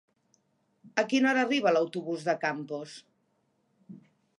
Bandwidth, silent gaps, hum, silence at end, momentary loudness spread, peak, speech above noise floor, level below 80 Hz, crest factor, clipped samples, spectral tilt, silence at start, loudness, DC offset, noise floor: 11 kHz; none; none; 0.4 s; 14 LU; -10 dBFS; 45 dB; -86 dBFS; 20 dB; under 0.1%; -4.5 dB/octave; 0.85 s; -28 LUFS; under 0.1%; -73 dBFS